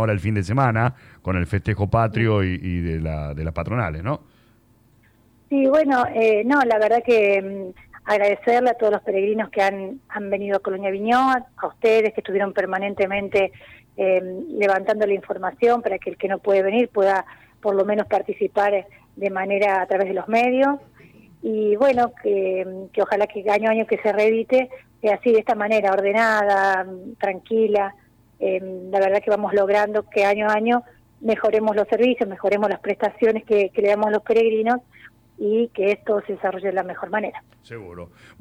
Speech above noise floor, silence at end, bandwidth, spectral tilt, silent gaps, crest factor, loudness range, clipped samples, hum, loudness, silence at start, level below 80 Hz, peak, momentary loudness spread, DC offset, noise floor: 36 dB; 0.35 s; 11 kHz; -7.5 dB/octave; none; 14 dB; 4 LU; under 0.1%; none; -21 LUFS; 0 s; -48 dBFS; -6 dBFS; 10 LU; under 0.1%; -56 dBFS